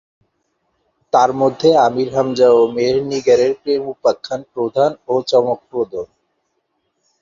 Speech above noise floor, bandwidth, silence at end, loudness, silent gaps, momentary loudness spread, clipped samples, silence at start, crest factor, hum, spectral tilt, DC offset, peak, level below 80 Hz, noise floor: 54 dB; 7.4 kHz; 1.15 s; -16 LUFS; none; 10 LU; under 0.1%; 1.15 s; 16 dB; none; -5.5 dB/octave; under 0.1%; -2 dBFS; -56 dBFS; -69 dBFS